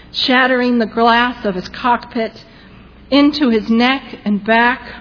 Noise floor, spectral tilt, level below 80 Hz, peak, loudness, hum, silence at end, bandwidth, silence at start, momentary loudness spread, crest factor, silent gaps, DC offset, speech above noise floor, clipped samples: -40 dBFS; -6 dB/octave; -44 dBFS; 0 dBFS; -14 LUFS; none; 0 s; 5.4 kHz; 0.15 s; 10 LU; 16 dB; none; under 0.1%; 26 dB; under 0.1%